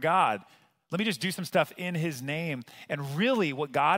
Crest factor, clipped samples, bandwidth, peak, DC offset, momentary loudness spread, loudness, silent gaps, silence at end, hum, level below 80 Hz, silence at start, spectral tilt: 20 dB; under 0.1%; 16 kHz; -10 dBFS; under 0.1%; 10 LU; -29 LUFS; none; 0 s; none; -76 dBFS; 0 s; -5 dB/octave